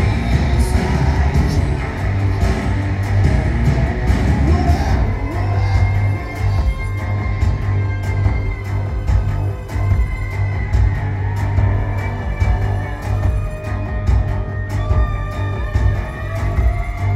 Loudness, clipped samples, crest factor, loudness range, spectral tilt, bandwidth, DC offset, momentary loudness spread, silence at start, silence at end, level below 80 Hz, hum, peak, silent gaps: -19 LUFS; under 0.1%; 14 dB; 3 LU; -7.5 dB/octave; 12 kHz; under 0.1%; 6 LU; 0 s; 0 s; -20 dBFS; none; -2 dBFS; none